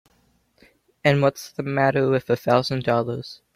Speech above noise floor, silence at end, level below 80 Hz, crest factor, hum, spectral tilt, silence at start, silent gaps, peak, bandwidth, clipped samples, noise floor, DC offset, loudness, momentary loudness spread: 42 dB; 0.2 s; -60 dBFS; 20 dB; none; -6.5 dB/octave; 1.05 s; none; -4 dBFS; 15.5 kHz; under 0.1%; -64 dBFS; under 0.1%; -22 LUFS; 9 LU